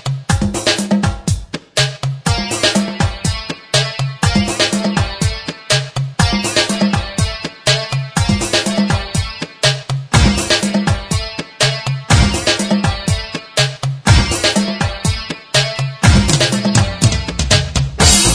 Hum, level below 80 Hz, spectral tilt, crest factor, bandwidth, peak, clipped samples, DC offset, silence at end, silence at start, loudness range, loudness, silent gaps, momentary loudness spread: none; -26 dBFS; -4 dB/octave; 16 dB; 11 kHz; 0 dBFS; under 0.1%; under 0.1%; 0 s; 0.05 s; 2 LU; -15 LUFS; none; 8 LU